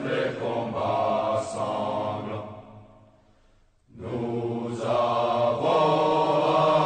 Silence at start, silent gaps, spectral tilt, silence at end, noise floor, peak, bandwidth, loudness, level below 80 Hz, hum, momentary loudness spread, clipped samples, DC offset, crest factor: 0 s; none; -6 dB/octave; 0 s; -60 dBFS; -10 dBFS; 9.4 kHz; -25 LUFS; -62 dBFS; none; 13 LU; under 0.1%; under 0.1%; 16 dB